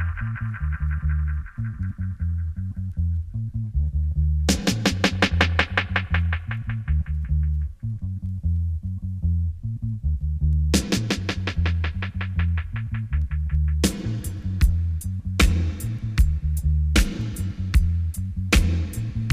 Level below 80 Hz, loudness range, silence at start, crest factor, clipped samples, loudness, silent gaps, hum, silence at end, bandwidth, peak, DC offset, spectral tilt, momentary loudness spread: -26 dBFS; 4 LU; 0 s; 20 dB; under 0.1%; -25 LUFS; none; none; 0 s; 15.5 kHz; -4 dBFS; under 0.1%; -5 dB/octave; 9 LU